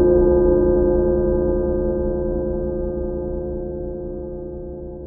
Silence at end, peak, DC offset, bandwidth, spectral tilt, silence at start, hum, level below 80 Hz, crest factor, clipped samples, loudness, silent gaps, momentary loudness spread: 0 s; -4 dBFS; under 0.1%; 1.7 kHz; -14 dB/octave; 0 s; none; -28 dBFS; 14 dB; under 0.1%; -20 LUFS; none; 15 LU